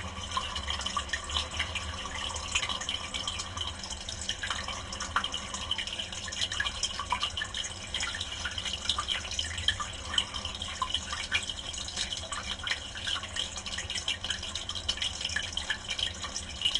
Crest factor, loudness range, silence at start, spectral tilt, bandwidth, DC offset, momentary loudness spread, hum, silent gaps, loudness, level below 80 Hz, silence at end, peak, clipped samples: 24 dB; 2 LU; 0 s; -1 dB/octave; 11.5 kHz; under 0.1%; 5 LU; none; none; -32 LUFS; -46 dBFS; 0 s; -10 dBFS; under 0.1%